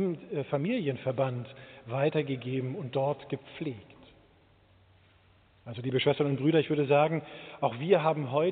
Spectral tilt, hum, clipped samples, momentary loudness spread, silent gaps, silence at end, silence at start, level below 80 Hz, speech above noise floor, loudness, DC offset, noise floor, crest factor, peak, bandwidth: -5.5 dB/octave; none; under 0.1%; 13 LU; none; 0 s; 0 s; -70 dBFS; 33 dB; -30 LUFS; under 0.1%; -62 dBFS; 20 dB; -10 dBFS; 4.6 kHz